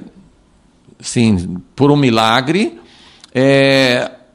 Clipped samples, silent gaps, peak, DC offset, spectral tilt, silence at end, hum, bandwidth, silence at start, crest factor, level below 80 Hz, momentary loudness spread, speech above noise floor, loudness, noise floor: under 0.1%; none; 0 dBFS; under 0.1%; -5.5 dB/octave; 0.25 s; none; 15 kHz; 0 s; 14 dB; -46 dBFS; 11 LU; 38 dB; -13 LUFS; -51 dBFS